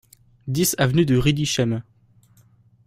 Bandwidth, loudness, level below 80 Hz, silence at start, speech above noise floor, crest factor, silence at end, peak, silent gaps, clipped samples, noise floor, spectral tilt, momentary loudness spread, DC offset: 16 kHz; -21 LUFS; -44 dBFS; 0.45 s; 36 dB; 18 dB; 1.05 s; -4 dBFS; none; under 0.1%; -56 dBFS; -5 dB/octave; 11 LU; under 0.1%